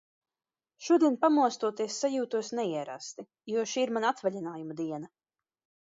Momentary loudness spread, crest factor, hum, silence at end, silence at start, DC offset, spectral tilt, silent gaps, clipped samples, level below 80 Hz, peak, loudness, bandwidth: 17 LU; 18 dB; none; 0.8 s; 0.8 s; under 0.1%; -4 dB/octave; none; under 0.1%; -84 dBFS; -12 dBFS; -30 LUFS; 7.8 kHz